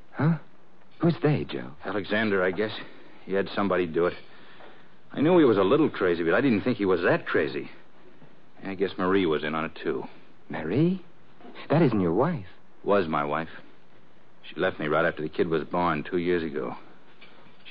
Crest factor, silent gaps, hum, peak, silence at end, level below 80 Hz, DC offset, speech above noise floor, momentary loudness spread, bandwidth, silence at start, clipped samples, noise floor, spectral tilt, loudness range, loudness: 16 dB; none; none; -10 dBFS; 0 s; -64 dBFS; 0.9%; 33 dB; 14 LU; 5.4 kHz; 0.15 s; under 0.1%; -58 dBFS; -10 dB/octave; 5 LU; -26 LUFS